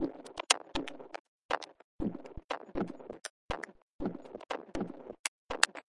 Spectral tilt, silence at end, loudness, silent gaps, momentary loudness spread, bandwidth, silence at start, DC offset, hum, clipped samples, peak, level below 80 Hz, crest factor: -2 dB/octave; 0.2 s; -36 LUFS; 1.19-1.49 s, 1.84-1.99 s, 2.44-2.49 s, 3.30-3.49 s, 3.82-3.99 s, 5.19-5.49 s; 18 LU; 11.5 kHz; 0 s; under 0.1%; none; under 0.1%; -4 dBFS; -56 dBFS; 34 dB